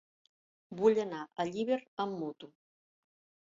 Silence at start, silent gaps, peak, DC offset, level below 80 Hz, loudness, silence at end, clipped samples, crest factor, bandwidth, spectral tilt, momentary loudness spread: 0.7 s; 1.88-1.97 s; -16 dBFS; under 0.1%; -78 dBFS; -34 LUFS; 1.05 s; under 0.1%; 20 dB; 7.6 kHz; -5 dB/octave; 14 LU